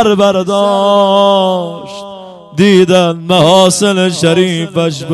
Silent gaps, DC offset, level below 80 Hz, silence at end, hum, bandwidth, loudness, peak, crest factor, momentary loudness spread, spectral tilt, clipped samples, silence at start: none; under 0.1%; -52 dBFS; 0 s; none; 12.5 kHz; -9 LUFS; 0 dBFS; 10 dB; 15 LU; -5 dB/octave; 0.7%; 0 s